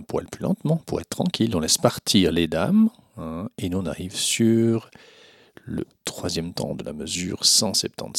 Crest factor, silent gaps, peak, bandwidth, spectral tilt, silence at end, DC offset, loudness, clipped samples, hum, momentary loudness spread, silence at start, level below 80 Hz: 22 dB; none; -2 dBFS; 16.5 kHz; -4 dB/octave; 0 s; under 0.1%; -23 LUFS; under 0.1%; none; 14 LU; 0 s; -50 dBFS